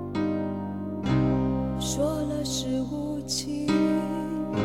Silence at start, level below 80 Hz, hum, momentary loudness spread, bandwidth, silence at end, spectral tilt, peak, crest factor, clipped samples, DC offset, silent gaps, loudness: 0 s; -44 dBFS; none; 7 LU; 16 kHz; 0 s; -5.5 dB/octave; -14 dBFS; 14 dB; under 0.1%; 0.2%; none; -28 LUFS